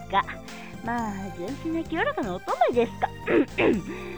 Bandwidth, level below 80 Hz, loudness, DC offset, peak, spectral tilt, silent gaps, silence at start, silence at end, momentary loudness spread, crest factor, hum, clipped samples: over 20 kHz; -48 dBFS; -27 LUFS; 0.4%; -10 dBFS; -6 dB/octave; none; 0 s; 0 s; 11 LU; 18 dB; none; under 0.1%